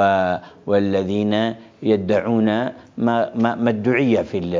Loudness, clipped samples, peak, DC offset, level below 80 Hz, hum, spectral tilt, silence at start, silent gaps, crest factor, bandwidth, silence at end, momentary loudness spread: -20 LUFS; under 0.1%; -4 dBFS; under 0.1%; -50 dBFS; none; -7.5 dB/octave; 0 s; none; 16 dB; 7.4 kHz; 0 s; 6 LU